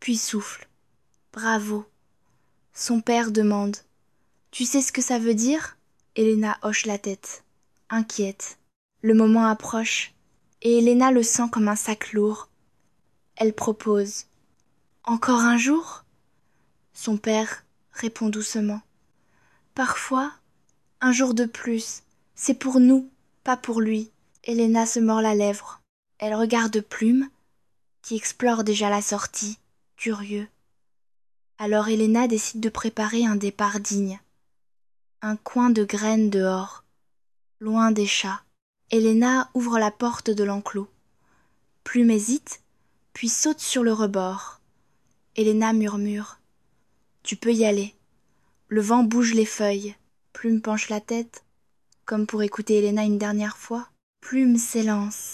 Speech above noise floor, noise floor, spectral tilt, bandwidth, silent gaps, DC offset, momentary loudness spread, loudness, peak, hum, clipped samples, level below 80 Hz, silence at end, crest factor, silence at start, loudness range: 58 dB; -81 dBFS; -4 dB/octave; 13 kHz; 8.76-8.89 s, 25.89-26.03 s, 38.62-38.74 s, 54.03-54.13 s; under 0.1%; 15 LU; -23 LUFS; -6 dBFS; none; under 0.1%; -68 dBFS; 0 s; 18 dB; 0 s; 5 LU